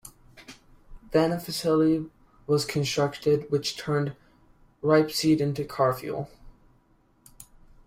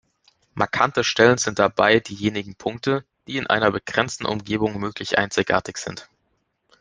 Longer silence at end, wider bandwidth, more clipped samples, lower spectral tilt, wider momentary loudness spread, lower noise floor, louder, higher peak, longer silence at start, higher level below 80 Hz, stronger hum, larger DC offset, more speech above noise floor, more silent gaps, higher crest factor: second, 0.45 s vs 0.75 s; first, 16 kHz vs 10 kHz; neither; first, -5.5 dB/octave vs -4 dB/octave; about the same, 11 LU vs 13 LU; second, -63 dBFS vs -71 dBFS; second, -26 LUFS vs -21 LUFS; second, -8 dBFS vs -2 dBFS; second, 0.05 s vs 0.55 s; about the same, -56 dBFS vs -56 dBFS; neither; neither; second, 38 dB vs 49 dB; neither; about the same, 18 dB vs 20 dB